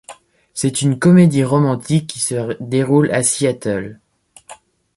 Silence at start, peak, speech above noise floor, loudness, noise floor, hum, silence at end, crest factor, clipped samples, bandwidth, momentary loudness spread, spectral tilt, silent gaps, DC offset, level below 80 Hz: 0.1 s; -2 dBFS; 28 dB; -16 LUFS; -43 dBFS; none; 0.4 s; 14 dB; under 0.1%; 11.5 kHz; 12 LU; -5.5 dB/octave; none; under 0.1%; -54 dBFS